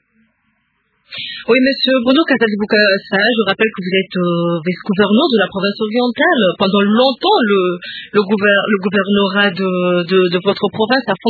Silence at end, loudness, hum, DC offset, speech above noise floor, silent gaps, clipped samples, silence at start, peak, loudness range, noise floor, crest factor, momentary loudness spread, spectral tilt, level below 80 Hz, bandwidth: 0 s; -14 LUFS; none; under 0.1%; 50 dB; none; under 0.1%; 1.1 s; 0 dBFS; 1 LU; -63 dBFS; 14 dB; 6 LU; -8 dB/octave; -58 dBFS; 4.8 kHz